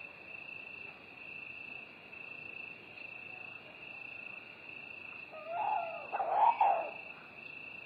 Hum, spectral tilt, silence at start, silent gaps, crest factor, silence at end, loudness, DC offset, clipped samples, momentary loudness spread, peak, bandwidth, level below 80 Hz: none; -5.5 dB/octave; 0 s; none; 22 dB; 0 s; -38 LUFS; under 0.1%; under 0.1%; 17 LU; -16 dBFS; 5.2 kHz; -82 dBFS